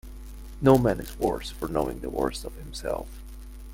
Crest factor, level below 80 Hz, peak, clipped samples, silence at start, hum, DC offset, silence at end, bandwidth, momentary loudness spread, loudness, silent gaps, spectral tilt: 24 dB; -40 dBFS; -4 dBFS; under 0.1%; 0.05 s; none; under 0.1%; 0 s; 17 kHz; 24 LU; -27 LUFS; none; -6.5 dB/octave